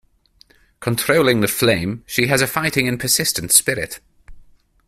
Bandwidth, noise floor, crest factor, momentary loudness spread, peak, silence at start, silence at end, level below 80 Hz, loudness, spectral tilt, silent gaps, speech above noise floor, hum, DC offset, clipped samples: 16 kHz; -54 dBFS; 20 dB; 11 LU; 0 dBFS; 0.8 s; 0.45 s; -48 dBFS; -17 LUFS; -3 dB/octave; none; 36 dB; none; under 0.1%; under 0.1%